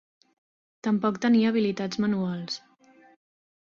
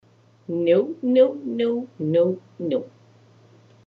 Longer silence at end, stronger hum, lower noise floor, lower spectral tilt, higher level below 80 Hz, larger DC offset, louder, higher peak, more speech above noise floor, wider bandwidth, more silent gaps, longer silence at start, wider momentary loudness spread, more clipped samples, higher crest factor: about the same, 1.1 s vs 1.05 s; neither; first, -57 dBFS vs -53 dBFS; second, -6 dB/octave vs -9 dB/octave; first, -68 dBFS vs -80 dBFS; neither; second, -26 LUFS vs -22 LUFS; second, -12 dBFS vs -6 dBFS; about the same, 33 dB vs 32 dB; first, 7.2 kHz vs 4.9 kHz; neither; first, 0.85 s vs 0.5 s; about the same, 12 LU vs 12 LU; neither; about the same, 16 dB vs 18 dB